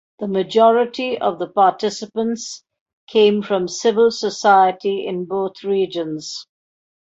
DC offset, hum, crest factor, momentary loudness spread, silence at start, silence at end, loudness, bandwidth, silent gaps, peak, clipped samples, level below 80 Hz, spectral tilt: under 0.1%; none; 16 dB; 12 LU; 0.2 s; 0.65 s; -18 LUFS; 8 kHz; 2.81-2.86 s, 2.93-3.07 s; -2 dBFS; under 0.1%; -66 dBFS; -4.5 dB/octave